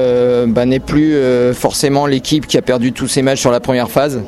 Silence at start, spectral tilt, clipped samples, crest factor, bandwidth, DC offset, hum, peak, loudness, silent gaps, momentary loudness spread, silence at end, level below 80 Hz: 0 s; -5 dB/octave; under 0.1%; 12 dB; 14.5 kHz; under 0.1%; none; 0 dBFS; -13 LUFS; none; 3 LU; 0 s; -38 dBFS